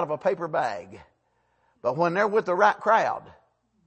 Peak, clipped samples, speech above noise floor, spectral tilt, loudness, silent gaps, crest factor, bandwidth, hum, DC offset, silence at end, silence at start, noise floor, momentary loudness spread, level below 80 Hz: -6 dBFS; under 0.1%; 45 dB; -6 dB/octave; -24 LUFS; none; 20 dB; 8.6 kHz; none; under 0.1%; 0.55 s; 0 s; -70 dBFS; 10 LU; -70 dBFS